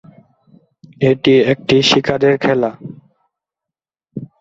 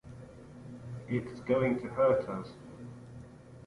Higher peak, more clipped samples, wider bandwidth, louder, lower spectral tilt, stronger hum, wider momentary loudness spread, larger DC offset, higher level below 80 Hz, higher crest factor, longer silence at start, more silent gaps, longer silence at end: first, 0 dBFS vs -16 dBFS; neither; second, 7.8 kHz vs 11 kHz; first, -14 LUFS vs -31 LUFS; second, -5.5 dB/octave vs -8.5 dB/octave; neither; about the same, 21 LU vs 22 LU; neither; first, -52 dBFS vs -60 dBFS; about the same, 16 dB vs 18 dB; first, 1 s vs 0.05 s; neither; first, 0.15 s vs 0 s